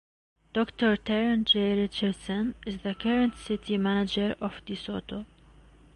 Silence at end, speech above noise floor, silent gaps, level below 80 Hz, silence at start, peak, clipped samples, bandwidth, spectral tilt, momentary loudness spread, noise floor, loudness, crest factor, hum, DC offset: 0.7 s; 27 dB; none; -54 dBFS; 0.55 s; -12 dBFS; under 0.1%; 11 kHz; -6 dB/octave; 12 LU; -55 dBFS; -28 LUFS; 16 dB; none; under 0.1%